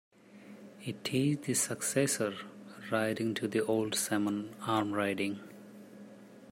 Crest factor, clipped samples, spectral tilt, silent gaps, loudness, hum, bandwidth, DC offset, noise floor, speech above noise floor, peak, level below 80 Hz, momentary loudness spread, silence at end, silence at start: 18 dB; under 0.1%; -4 dB/octave; none; -32 LUFS; none; 16 kHz; under 0.1%; -53 dBFS; 21 dB; -16 dBFS; -76 dBFS; 21 LU; 0 s; 0.3 s